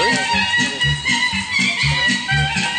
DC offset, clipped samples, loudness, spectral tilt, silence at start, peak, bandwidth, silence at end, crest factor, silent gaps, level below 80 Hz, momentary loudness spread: under 0.1%; under 0.1%; -16 LUFS; -3 dB/octave; 0 s; -6 dBFS; 10.5 kHz; 0 s; 12 dB; none; -36 dBFS; 2 LU